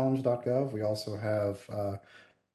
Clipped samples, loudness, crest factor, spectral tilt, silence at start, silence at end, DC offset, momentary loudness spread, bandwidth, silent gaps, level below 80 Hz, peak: under 0.1%; -32 LUFS; 16 dB; -7.5 dB/octave; 0 s; 0.35 s; under 0.1%; 7 LU; 12.5 kHz; none; -62 dBFS; -16 dBFS